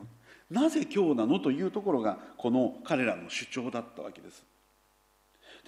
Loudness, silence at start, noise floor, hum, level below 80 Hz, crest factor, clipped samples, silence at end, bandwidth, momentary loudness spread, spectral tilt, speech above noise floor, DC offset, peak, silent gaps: -30 LUFS; 0 s; -68 dBFS; none; -74 dBFS; 16 dB; under 0.1%; 0.1 s; 12.5 kHz; 12 LU; -5.5 dB/octave; 38 dB; under 0.1%; -14 dBFS; none